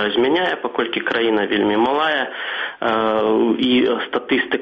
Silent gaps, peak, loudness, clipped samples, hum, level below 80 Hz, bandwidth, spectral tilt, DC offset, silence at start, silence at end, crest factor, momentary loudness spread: none; -4 dBFS; -18 LUFS; under 0.1%; none; -58 dBFS; 6.4 kHz; -6.5 dB/octave; under 0.1%; 0 s; 0 s; 14 dB; 6 LU